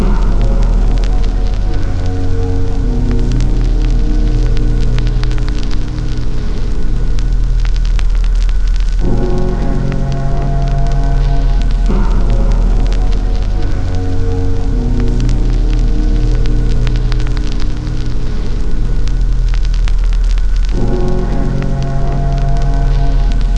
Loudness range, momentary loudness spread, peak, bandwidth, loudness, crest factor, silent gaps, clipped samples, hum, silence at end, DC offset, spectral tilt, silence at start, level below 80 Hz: 2 LU; 4 LU; 0 dBFS; 7.4 kHz; -17 LUFS; 10 dB; none; under 0.1%; none; 0 s; under 0.1%; -7.5 dB/octave; 0 s; -12 dBFS